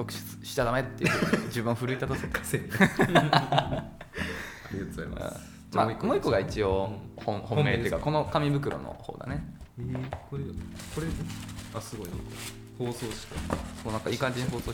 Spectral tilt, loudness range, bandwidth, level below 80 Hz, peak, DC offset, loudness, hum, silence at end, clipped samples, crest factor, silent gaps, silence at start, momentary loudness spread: -5.5 dB/octave; 10 LU; 19 kHz; -46 dBFS; -6 dBFS; under 0.1%; -30 LUFS; none; 0 s; under 0.1%; 24 dB; none; 0 s; 14 LU